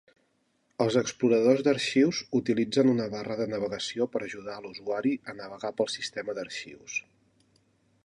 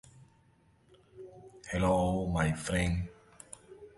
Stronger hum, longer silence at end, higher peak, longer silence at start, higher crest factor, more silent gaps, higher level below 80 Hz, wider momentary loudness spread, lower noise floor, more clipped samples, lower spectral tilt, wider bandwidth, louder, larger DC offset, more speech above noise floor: neither; first, 1.05 s vs 0.1 s; first, -10 dBFS vs -16 dBFS; second, 0.8 s vs 1.15 s; about the same, 20 dB vs 18 dB; neither; second, -70 dBFS vs -46 dBFS; second, 14 LU vs 23 LU; first, -72 dBFS vs -66 dBFS; neither; about the same, -5 dB/octave vs -6 dB/octave; about the same, 11.5 kHz vs 11.5 kHz; first, -28 LUFS vs -31 LUFS; neither; first, 44 dB vs 36 dB